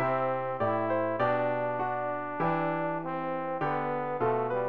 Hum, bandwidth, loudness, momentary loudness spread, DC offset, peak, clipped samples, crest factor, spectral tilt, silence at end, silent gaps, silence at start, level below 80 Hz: none; 5.6 kHz; -30 LUFS; 5 LU; 0.4%; -16 dBFS; under 0.1%; 14 dB; -9.5 dB/octave; 0 s; none; 0 s; -66 dBFS